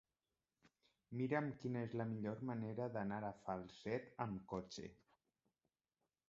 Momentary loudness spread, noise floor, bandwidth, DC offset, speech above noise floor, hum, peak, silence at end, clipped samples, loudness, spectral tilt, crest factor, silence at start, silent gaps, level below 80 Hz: 7 LU; under -90 dBFS; 7.6 kHz; under 0.1%; over 45 dB; none; -26 dBFS; 1.35 s; under 0.1%; -46 LUFS; -6.5 dB/octave; 20 dB; 1.1 s; none; -76 dBFS